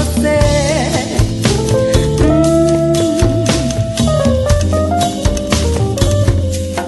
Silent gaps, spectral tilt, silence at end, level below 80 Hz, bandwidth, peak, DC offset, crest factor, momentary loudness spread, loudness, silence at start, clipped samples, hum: none; -5.5 dB/octave; 0 s; -22 dBFS; 12.5 kHz; 0 dBFS; under 0.1%; 12 dB; 4 LU; -13 LUFS; 0 s; under 0.1%; none